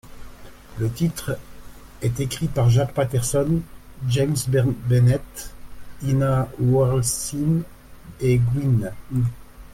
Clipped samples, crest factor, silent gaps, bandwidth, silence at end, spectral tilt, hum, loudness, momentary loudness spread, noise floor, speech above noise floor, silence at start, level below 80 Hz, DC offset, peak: under 0.1%; 14 dB; none; 16 kHz; 0 s; -6.5 dB/octave; none; -22 LUFS; 12 LU; -40 dBFS; 20 dB; 0.05 s; -42 dBFS; under 0.1%; -8 dBFS